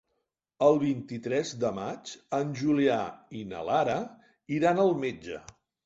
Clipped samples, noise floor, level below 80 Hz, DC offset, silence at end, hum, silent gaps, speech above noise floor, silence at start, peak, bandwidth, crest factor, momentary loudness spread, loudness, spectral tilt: under 0.1%; -81 dBFS; -66 dBFS; under 0.1%; 0.45 s; none; none; 53 dB; 0.6 s; -10 dBFS; 8 kHz; 20 dB; 16 LU; -28 LUFS; -6 dB/octave